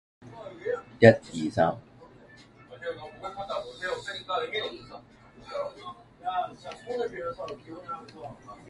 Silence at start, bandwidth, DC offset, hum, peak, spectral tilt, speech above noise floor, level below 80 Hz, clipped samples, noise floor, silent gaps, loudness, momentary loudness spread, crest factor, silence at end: 0.2 s; 11.5 kHz; under 0.1%; none; -2 dBFS; -6.5 dB/octave; 27 dB; -62 dBFS; under 0.1%; -53 dBFS; none; -29 LUFS; 20 LU; 28 dB; 0 s